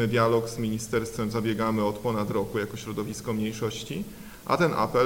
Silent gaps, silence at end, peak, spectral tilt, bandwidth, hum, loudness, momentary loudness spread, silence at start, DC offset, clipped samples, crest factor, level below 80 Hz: none; 0 s; -8 dBFS; -5.5 dB/octave; 18 kHz; none; -28 LUFS; 10 LU; 0 s; under 0.1%; under 0.1%; 18 dB; -52 dBFS